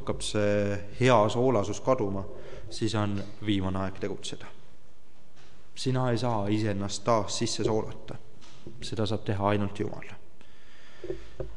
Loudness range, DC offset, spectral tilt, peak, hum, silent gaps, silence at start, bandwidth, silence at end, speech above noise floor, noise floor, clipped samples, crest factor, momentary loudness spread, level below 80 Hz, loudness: 6 LU; 2%; -5.5 dB/octave; -8 dBFS; none; none; 0 s; 11.5 kHz; 0 s; 30 dB; -59 dBFS; under 0.1%; 22 dB; 19 LU; -54 dBFS; -29 LUFS